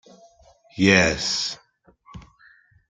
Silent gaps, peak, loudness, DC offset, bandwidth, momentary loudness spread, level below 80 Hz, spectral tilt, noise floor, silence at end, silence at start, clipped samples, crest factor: none; -2 dBFS; -20 LUFS; under 0.1%; 9.4 kHz; 22 LU; -50 dBFS; -3.5 dB/octave; -57 dBFS; 0.7 s; 0.75 s; under 0.1%; 24 dB